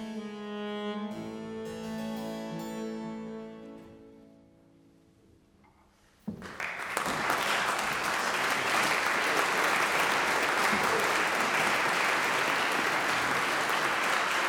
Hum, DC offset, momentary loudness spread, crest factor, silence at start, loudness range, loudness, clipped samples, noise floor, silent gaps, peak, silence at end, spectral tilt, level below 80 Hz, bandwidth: none; under 0.1%; 14 LU; 20 dB; 0 s; 18 LU; -28 LUFS; under 0.1%; -63 dBFS; none; -12 dBFS; 0 s; -2 dB/octave; -66 dBFS; over 20 kHz